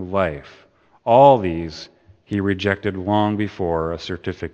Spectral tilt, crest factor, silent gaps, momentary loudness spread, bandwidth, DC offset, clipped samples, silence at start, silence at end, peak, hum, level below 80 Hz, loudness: -7.5 dB/octave; 20 dB; none; 16 LU; 8.2 kHz; under 0.1%; under 0.1%; 0 s; 0.05 s; 0 dBFS; none; -46 dBFS; -19 LUFS